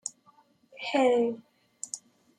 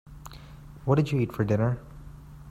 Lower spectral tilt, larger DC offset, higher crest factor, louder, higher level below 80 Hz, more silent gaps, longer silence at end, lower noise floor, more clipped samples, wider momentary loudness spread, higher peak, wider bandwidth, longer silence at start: second, -2.5 dB/octave vs -8.5 dB/octave; neither; about the same, 18 dB vs 18 dB; about the same, -29 LUFS vs -27 LUFS; second, -84 dBFS vs -48 dBFS; neither; first, 0.4 s vs 0 s; first, -63 dBFS vs -45 dBFS; neither; second, 18 LU vs 23 LU; about the same, -12 dBFS vs -10 dBFS; second, 11 kHz vs 14.5 kHz; about the same, 0.05 s vs 0.05 s